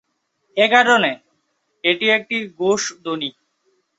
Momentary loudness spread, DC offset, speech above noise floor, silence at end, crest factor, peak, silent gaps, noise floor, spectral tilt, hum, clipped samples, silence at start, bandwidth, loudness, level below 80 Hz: 13 LU; under 0.1%; 51 dB; 0.7 s; 20 dB; 0 dBFS; none; -68 dBFS; -2.5 dB/octave; none; under 0.1%; 0.55 s; 8.2 kHz; -18 LUFS; -68 dBFS